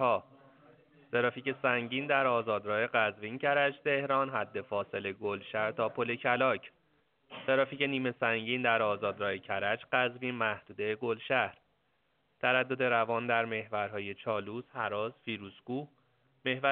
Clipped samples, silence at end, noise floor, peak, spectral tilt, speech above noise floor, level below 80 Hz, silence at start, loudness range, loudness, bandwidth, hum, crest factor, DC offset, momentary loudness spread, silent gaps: under 0.1%; 0 s; -75 dBFS; -12 dBFS; -2.5 dB/octave; 43 dB; -78 dBFS; 0 s; 3 LU; -32 LUFS; 4.4 kHz; none; 20 dB; under 0.1%; 9 LU; none